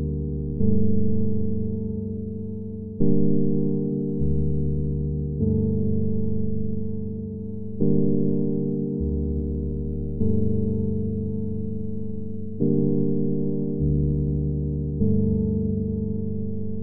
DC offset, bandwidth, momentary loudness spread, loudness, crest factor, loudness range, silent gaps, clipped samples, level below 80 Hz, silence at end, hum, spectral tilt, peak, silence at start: under 0.1%; 1 kHz; 9 LU; -26 LUFS; 16 dB; 2 LU; none; under 0.1%; -34 dBFS; 0 s; none; -13.5 dB/octave; -6 dBFS; 0 s